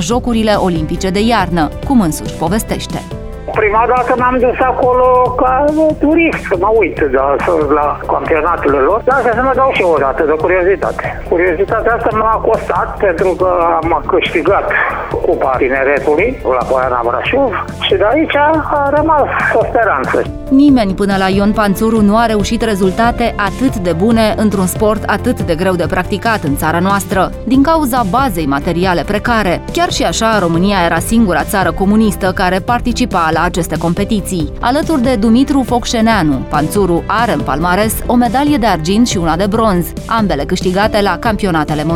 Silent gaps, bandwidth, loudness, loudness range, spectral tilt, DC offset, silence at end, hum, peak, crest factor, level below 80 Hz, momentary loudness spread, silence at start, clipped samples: none; 17 kHz; -12 LUFS; 2 LU; -5.5 dB/octave; under 0.1%; 0 s; none; 0 dBFS; 12 dB; -28 dBFS; 5 LU; 0 s; under 0.1%